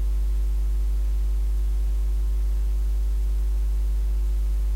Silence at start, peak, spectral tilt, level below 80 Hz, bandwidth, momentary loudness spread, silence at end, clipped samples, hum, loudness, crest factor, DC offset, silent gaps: 0 s; -18 dBFS; -6.5 dB/octave; -22 dBFS; 4.5 kHz; 0 LU; 0 s; under 0.1%; none; -27 LUFS; 4 dB; under 0.1%; none